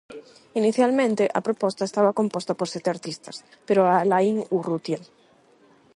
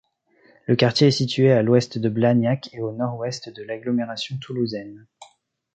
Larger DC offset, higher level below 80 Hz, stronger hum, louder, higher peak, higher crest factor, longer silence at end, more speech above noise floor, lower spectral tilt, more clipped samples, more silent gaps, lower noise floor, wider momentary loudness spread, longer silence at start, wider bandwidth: neither; second, -72 dBFS vs -62 dBFS; neither; about the same, -23 LUFS vs -21 LUFS; about the same, -6 dBFS vs -4 dBFS; about the same, 16 dB vs 18 dB; first, 0.9 s vs 0.5 s; about the same, 34 dB vs 37 dB; about the same, -6 dB/octave vs -6.5 dB/octave; neither; neither; about the same, -57 dBFS vs -58 dBFS; about the same, 15 LU vs 15 LU; second, 0.1 s vs 0.7 s; first, 11.5 kHz vs 8.8 kHz